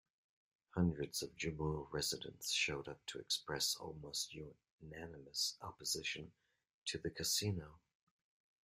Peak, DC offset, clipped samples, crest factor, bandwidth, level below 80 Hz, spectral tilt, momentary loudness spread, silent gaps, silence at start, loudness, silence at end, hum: -24 dBFS; under 0.1%; under 0.1%; 20 dB; 16 kHz; -66 dBFS; -3 dB/octave; 15 LU; 4.70-4.79 s, 6.74-6.86 s; 0.75 s; -41 LUFS; 0.85 s; none